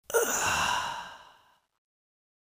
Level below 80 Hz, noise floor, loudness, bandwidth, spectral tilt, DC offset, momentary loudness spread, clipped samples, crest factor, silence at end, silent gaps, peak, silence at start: -58 dBFS; -62 dBFS; -28 LUFS; 16 kHz; -1 dB/octave; under 0.1%; 14 LU; under 0.1%; 20 dB; 1.25 s; none; -12 dBFS; 0.1 s